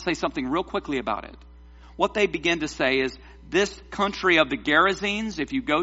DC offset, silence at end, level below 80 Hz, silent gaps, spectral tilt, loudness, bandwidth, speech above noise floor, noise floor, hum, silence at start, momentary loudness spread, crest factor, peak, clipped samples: under 0.1%; 0 s; -48 dBFS; none; -2 dB/octave; -24 LUFS; 8 kHz; 22 dB; -47 dBFS; none; 0 s; 8 LU; 22 dB; -4 dBFS; under 0.1%